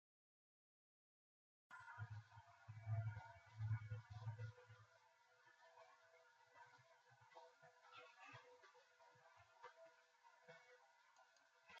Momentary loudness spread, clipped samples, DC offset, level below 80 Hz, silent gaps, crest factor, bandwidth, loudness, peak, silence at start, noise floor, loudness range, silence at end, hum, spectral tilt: 19 LU; under 0.1%; under 0.1%; -84 dBFS; none; 20 dB; 7.4 kHz; -56 LUFS; -38 dBFS; 1.7 s; -76 dBFS; 15 LU; 0 s; none; -5.5 dB/octave